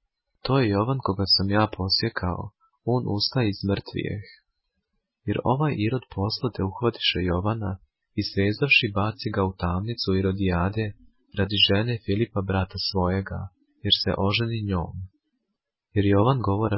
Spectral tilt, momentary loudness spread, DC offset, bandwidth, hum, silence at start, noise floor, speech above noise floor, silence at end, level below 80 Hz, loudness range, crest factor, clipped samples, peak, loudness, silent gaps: -9.5 dB/octave; 14 LU; under 0.1%; 5.8 kHz; none; 0.45 s; -82 dBFS; 58 dB; 0 s; -42 dBFS; 4 LU; 18 dB; under 0.1%; -6 dBFS; -24 LUFS; none